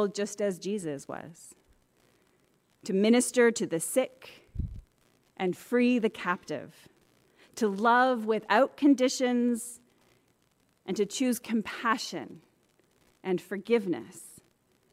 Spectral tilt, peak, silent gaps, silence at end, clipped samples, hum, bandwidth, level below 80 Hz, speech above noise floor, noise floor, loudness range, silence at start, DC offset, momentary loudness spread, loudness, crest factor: -4.5 dB/octave; -10 dBFS; none; 0.6 s; under 0.1%; none; 16 kHz; -56 dBFS; 42 dB; -70 dBFS; 6 LU; 0 s; under 0.1%; 19 LU; -28 LUFS; 20 dB